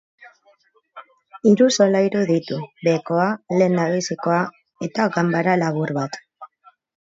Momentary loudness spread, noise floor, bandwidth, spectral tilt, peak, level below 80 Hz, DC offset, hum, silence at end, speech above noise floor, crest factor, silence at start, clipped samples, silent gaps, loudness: 13 LU; -54 dBFS; 7.8 kHz; -5.5 dB/octave; -4 dBFS; -68 dBFS; under 0.1%; none; 0.6 s; 34 dB; 18 dB; 0.2 s; under 0.1%; none; -20 LUFS